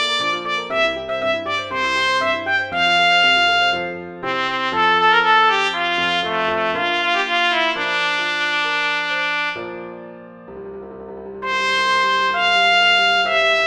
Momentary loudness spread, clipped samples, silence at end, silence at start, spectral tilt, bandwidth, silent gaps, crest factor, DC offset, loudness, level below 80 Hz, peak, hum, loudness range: 17 LU; under 0.1%; 0 s; 0 s; -2 dB/octave; 11 kHz; none; 16 dB; under 0.1%; -17 LUFS; -56 dBFS; -4 dBFS; none; 6 LU